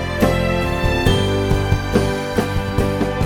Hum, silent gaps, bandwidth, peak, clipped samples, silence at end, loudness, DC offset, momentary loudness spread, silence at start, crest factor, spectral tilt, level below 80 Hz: none; none; 17.5 kHz; -2 dBFS; under 0.1%; 0 s; -18 LUFS; under 0.1%; 4 LU; 0 s; 16 dB; -6 dB/octave; -26 dBFS